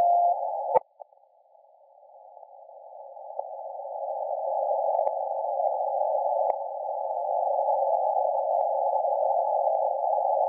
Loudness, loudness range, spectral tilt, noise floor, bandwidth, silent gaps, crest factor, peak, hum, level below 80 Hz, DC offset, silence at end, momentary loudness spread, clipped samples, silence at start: -27 LUFS; 11 LU; 2 dB/octave; -60 dBFS; 2.4 kHz; none; 20 dB; -8 dBFS; none; -90 dBFS; under 0.1%; 0 s; 12 LU; under 0.1%; 0 s